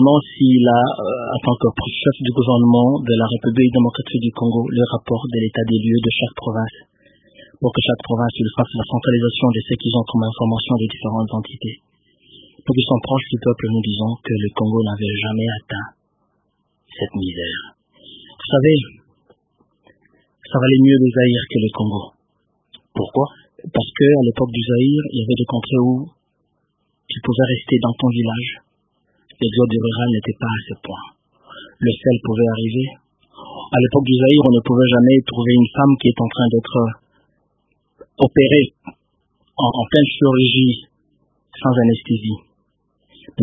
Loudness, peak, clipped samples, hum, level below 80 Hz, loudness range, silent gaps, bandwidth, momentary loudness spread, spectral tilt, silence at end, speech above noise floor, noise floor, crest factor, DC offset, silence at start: -17 LUFS; 0 dBFS; under 0.1%; 50 Hz at -55 dBFS; -48 dBFS; 7 LU; none; 3.8 kHz; 13 LU; -10.5 dB/octave; 0 s; 52 dB; -68 dBFS; 18 dB; under 0.1%; 0 s